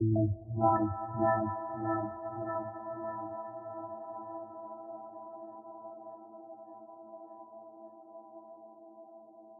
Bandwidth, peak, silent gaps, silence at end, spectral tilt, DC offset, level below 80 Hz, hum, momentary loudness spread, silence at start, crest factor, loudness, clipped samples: 1.9 kHz; -14 dBFS; none; 0 s; -5.5 dB/octave; under 0.1%; -64 dBFS; none; 22 LU; 0 s; 22 dB; -35 LUFS; under 0.1%